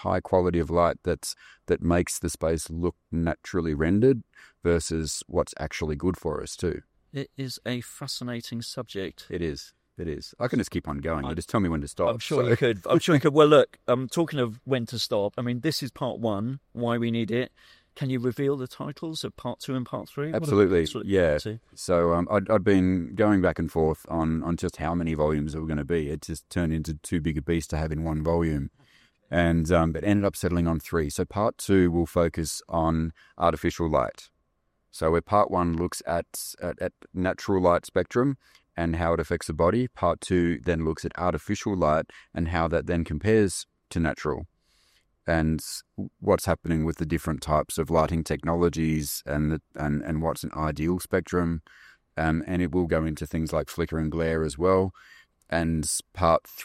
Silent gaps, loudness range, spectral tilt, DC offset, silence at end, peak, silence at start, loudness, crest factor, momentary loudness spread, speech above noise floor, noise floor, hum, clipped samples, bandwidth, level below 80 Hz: none; 6 LU; -6 dB/octave; under 0.1%; 0 s; -6 dBFS; 0 s; -26 LUFS; 20 dB; 11 LU; 48 dB; -74 dBFS; none; under 0.1%; 15.5 kHz; -46 dBFS